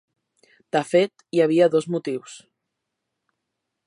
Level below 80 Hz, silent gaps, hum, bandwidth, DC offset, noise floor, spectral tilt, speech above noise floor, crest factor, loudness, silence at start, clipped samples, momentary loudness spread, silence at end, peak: -78 dBFS; none; none; 11.5 kHz; under 0.1%; -81 dBFS; -6 dB/octave; 60 dB; 20 dB; -22 LUFS; 0.75 s; under 0.1%; 13 LU; 1.5 s; -6 dBFS